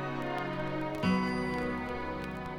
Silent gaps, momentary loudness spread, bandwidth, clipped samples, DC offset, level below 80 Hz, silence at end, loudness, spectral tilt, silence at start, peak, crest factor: none; 7 LU; 13 kHz; under 0.1%; under 0.1%; -52 dBFS; 0 s; -34 LUFS; -7 dB/octave; 0 s; -18 dBFS; 16 dB